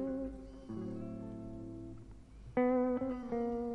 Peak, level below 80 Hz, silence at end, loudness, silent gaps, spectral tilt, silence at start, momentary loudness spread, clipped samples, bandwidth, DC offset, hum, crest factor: -22 dBFS; -56 dBFS; 0 s; -38 LUFS; none; -9 dB/octave; 0 s; 18 LU; under 0.1%; 6.2 kHz; under 0.1%; none; 16 dB